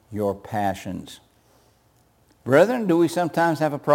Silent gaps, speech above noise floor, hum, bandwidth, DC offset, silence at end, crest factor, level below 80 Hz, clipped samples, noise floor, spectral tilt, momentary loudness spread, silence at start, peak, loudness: none; 39 dB; none; 17 kHz; under 0.1%; 0 s; 20 dB; -62 dBFS; under 0.1%; -60 dBFS; -6.5 dB/octave; 17 LU; 0.1 s; -4 dBFS; -22 LUFS